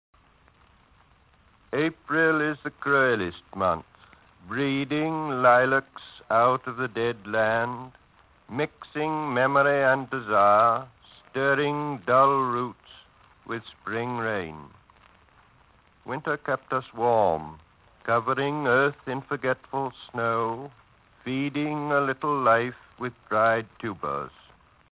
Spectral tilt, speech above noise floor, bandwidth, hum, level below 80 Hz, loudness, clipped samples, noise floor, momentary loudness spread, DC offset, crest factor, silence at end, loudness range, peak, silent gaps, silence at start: -9.5 dB/octave; 35 dB; 4 kHz; none; -60 dBFS; -25 LUFS; under 0.1%; -60 dBFS; 15 LU; under 0.1%; 20 dB; 0.7 s; 6 LU; -8 dBFS; none; 1.7 s